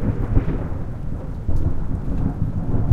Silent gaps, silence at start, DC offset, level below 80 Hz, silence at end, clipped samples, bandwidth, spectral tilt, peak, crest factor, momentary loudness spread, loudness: none; 0 s; under 0.1%; -24 dBFS; 0 s; under 0.1%; 3.2 kHz; -10.5 dB/octave; -2 dBFS; 18 dB; 7 LU; -25 LUFS